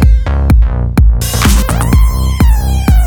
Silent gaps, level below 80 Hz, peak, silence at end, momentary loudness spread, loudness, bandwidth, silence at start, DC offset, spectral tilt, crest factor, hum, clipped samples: none; -10 dBFS; 0 dBFS; 0 s; 2 LU; -11 LUFS; 19.5 kHz; 0 s; under 0.1%; -5.5 dB/octave; 8 dB; none; under 0.1%